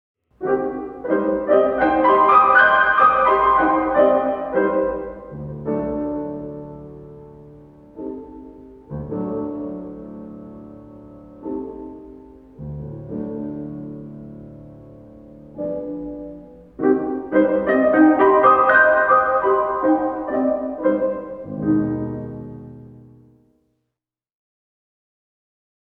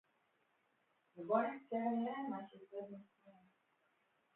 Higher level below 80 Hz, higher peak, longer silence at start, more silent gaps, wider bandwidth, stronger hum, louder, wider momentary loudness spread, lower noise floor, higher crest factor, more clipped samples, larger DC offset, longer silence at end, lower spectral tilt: first, -50 dBFS vs under -90 dBFS; first, -2 dBFS vs -22 dBFS; second, 0.4 s vs 1.15 s; neither; first, 4.8 kHz vs 4 kHz; neither; first, -18 LUFS vs -41 LUFS; first, 24 LU vs 16 LU; about the same, -83 dBFS vs -80 dBFS; about the same, 18 dB vs 22 dB; neither; neither; first, 2.85 s vs 1.05 s; first, -9 dB/octave vs -5.5 dB/octave